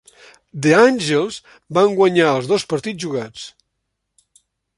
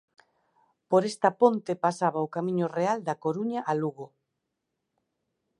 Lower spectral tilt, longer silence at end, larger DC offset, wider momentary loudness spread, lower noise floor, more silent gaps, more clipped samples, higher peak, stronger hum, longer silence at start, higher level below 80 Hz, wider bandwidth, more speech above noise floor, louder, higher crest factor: second, -5 dB/octave vs -6.5 dB/octave; second, 1.3 s vs 1.55 s; neither; first, 21 LU vs 7 LU; second, -75 dBFS vs -82 dBFS; neither; neither; first, -2 dBFS vs -8 dBFS; neither; second, 0.55 s vs 0.9 s; first, -62 dBFS vs -78 dBFS; about the same, 11.5 kHz vs 11.5 kHz; about the same, 59 dB vs 56 dB; first, -17 LUFS vs -27 LUFS; about the same, 18 dB vs 22 dB